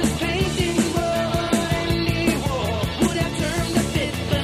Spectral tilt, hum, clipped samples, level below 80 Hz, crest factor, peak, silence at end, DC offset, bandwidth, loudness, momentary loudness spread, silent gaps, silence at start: -5 dB/octave; none; under 0.1%; -34 dBFS; 16 dB; -6 dBFS; 0 s; under 0.1%; 15.5 kHz; -22 LUFS; 3 LU; none; 0 s